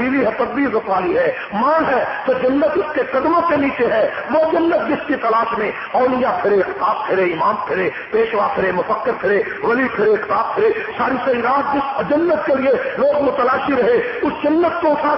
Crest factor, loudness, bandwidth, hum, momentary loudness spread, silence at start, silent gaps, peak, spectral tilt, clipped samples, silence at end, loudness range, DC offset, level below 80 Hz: 12 dB; -17 LUFS; 5.8 kHz; none; 3 LU; 0 s; none; -6 dBFS; -10.5 dB/octave; under 0.1%; 0 s; 1 LU; under 0.1%; -50 dBFS